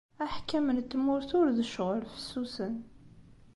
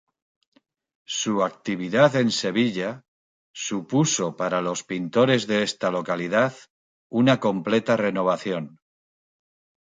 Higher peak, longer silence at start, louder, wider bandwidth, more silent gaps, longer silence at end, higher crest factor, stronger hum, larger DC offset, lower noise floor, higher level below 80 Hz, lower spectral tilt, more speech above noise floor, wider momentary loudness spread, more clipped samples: second, -18 dBFS vs -4 dBFS; second, 0.2 s vs 1.1 s; second, -32 LUFS vs -23 LUFS; first, 11.5 kHz vs 9.6 kHz; second, none vs 3.08-3.54 s, 6.70-7.10 s; second, 0.2 s vs 1.1 s; second, 14 dB vs 20 dB; neither; neither; second, -55 dBFS vs under -90 dBFS; first, -58 dBFS vs -68 dBFS; first, -6 dB/octave vs -4.5 dB/octave; second, 24 dB vs over 67 dB; about the same, 10 LU vs 10 LU; neither